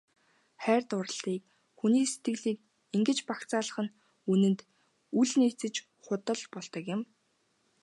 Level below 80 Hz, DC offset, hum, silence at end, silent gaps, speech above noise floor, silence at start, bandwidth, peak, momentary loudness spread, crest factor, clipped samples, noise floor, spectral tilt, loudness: -84 dBFS; under 0.1%; none; 0.8 s; none; 44 dB; 0.6 s; 11.5 kHz; -12 dBFS; 12 LU; 18 dB; under 0.1%; -74 dBFS; -5 dB/octave; -31 LUFS